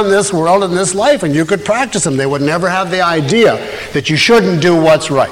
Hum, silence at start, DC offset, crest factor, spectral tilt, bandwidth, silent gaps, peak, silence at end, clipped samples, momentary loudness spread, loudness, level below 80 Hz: none; 0 s; under 0.1%; 10 dB; -4.5 dB/octave; 16.5 kHz; none; -2 dBFS; 0 s; under 0.1%; 5 LU; -12 LUFS; -44 dBFS